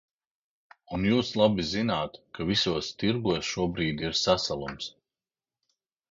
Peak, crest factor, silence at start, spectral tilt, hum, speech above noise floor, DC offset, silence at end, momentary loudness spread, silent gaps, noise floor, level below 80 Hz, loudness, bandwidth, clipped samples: -8 dBFS; 20 dB; 0.9 s; -5 dB/octave; none; over 62 dB; under 0.1%; 1.2 s; 12 LU; none; under -90 dBFS; -52 dBFS; -27 LUFS; 7.8 kHz; under 0.1%